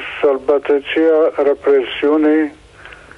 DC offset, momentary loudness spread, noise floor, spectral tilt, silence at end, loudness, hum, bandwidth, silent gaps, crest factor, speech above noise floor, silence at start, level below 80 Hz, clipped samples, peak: under 0.1%; 4 LU; -39 dBFS; -5.5 dB/octave; 0.25 s; -15 LUFS; none; 5.4 kHz; none; 10 dB; 25 dB; 0 s; -52 dBFS; under 0.1%; -4 dBFS